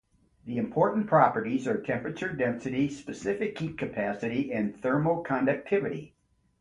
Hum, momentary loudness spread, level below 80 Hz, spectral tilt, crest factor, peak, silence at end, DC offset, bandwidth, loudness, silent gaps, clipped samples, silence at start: none; 10 LU; -62 dBFS; -7.5 dB/octave; 22 dB; -6 dBFS; 0.55 s; under 0.1%; 11 kHz; -29 LUFS; none; under 0.1%; 0.45 s